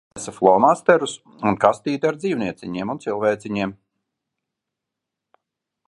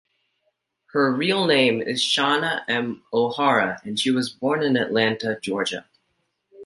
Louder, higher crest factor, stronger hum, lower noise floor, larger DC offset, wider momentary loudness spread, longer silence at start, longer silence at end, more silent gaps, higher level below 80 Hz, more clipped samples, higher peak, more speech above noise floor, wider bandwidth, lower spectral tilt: about the same, -20 LUFS vs -22 LUFS; about the same, 22 dB vs 18 dB; neither; first, -84 dBFS vs -73 dBFS; neither; first, 13 LU vs 7 LU; second, 0.15 s vs 0.95 s; first, 2.15 s vs 0 s; neither; first, -60 dBFS vs -68 dBFS; neither; first, 0 dBFS vs -4 dBFS; first, 64 dB vs 51 dB; about the same, 11.5 kHz vs 11.5 kHz; first, -5.5 dB/octave vs -4 dB/octave